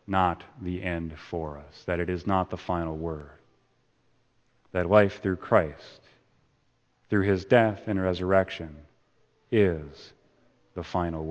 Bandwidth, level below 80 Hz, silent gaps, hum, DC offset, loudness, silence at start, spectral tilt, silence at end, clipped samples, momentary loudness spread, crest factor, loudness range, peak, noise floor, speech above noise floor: 8.4 kHz; -50 dBFS; none; none; under 0.1%; -27 LUFS; 0.1 s; -8 dB/octave; 0 s; under 0.1%; 16 LU; 24 dB; 6 LU; -4 dBFS; -69 dBFS; 42 dB